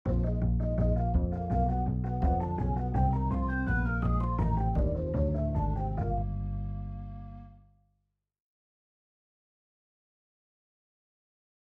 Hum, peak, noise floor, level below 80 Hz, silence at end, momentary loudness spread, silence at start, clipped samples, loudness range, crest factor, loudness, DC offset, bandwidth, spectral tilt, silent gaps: 50 Hz at -55 dBFS; -16 dBFS; -80 dBFS; -34 dBFS; 4.15 s; 9 LU; 0.05 s; under 0.1%; 12 LU; 14 dB; -30 LUFS; under 0.1%; 3.3 kHz; -11 dB/octave; none